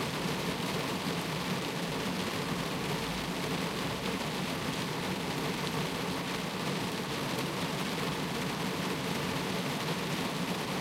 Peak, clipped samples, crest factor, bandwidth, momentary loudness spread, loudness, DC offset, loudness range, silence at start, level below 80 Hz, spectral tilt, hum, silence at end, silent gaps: -20 dBFS; under 0.1%; 14 dB; 16 kHz; 1 LU; -33 LUFS; under 0.1%; 0 LU; 0 s; -56 dBFS; -4 dB/octave; none; 0 s; none